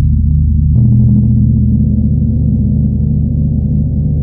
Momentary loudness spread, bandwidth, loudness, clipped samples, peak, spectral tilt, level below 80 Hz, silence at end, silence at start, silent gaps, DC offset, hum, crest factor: 4 LU; 0.9 kHz; -11 LUFS; under 0.1%; -2 dBFS; -16 dB/octave; -16 dBFS; 0 s; 0 s; none; under 0.1%; 50 Hz at -40 dBFS; 8 dB